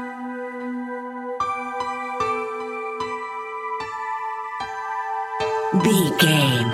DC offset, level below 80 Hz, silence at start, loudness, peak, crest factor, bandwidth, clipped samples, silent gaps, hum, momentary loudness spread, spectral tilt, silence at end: under 0.1%; -60 dBFS; 0 s; -24 LUFS; -2 dBFS; 20 dB; 16 kHz; under 0.1%; none; none; 13 LU; -4.5 dB/octave; 0 s